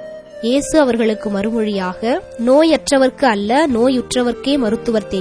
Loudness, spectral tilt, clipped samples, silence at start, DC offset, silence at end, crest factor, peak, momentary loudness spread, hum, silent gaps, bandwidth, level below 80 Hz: -16 LUFS; -4.5 dB/octave; under 0.1%; 0 s; under 0.1%; 0 s; 14 dB; 0 dBFS; 7 LU; none; none; 11 kHz; -44 dBFS